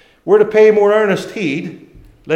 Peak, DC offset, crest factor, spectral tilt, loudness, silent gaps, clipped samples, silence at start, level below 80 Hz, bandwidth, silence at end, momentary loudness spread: 0 dBFS; under 0.1%; 14 dB; -6 dB/octave; -13 LUFS; none; under 0.1%; 0.25 s; -52 dBFS; 8.8 kHz; 0 s; 12 LU